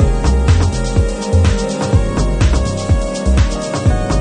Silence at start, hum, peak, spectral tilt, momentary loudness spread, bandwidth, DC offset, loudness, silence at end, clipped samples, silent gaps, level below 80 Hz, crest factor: 0 s; none; 0 dBFS; -6 dB/octave; 3 LU; 10.5 kHz; under 0.1%; -15 LUFS; 0 s; under 0.1%; none; -16 dBFS; 12 dB